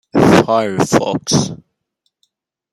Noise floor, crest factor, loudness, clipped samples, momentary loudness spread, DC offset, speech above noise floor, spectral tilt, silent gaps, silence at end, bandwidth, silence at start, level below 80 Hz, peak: -70 dBFS; 14 dB; -14 LUFS; under 0.1%; 10 LU; under 0.1%; 54 dB; -5 dB/octave; none; 1.15 s; 15 kHz; 0.15 s; -46 dBFS; 0 dBFS